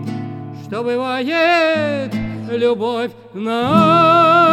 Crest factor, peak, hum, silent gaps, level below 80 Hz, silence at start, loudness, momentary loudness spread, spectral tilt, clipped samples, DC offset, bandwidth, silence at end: 16 dB; 0 dBFS; none; none; -48 dBFS; 0 s; -15 LUFS; 16 LU; -6.5 dB/octave; under 0.1%; under 0.1%; 14.5 kHz; 0 s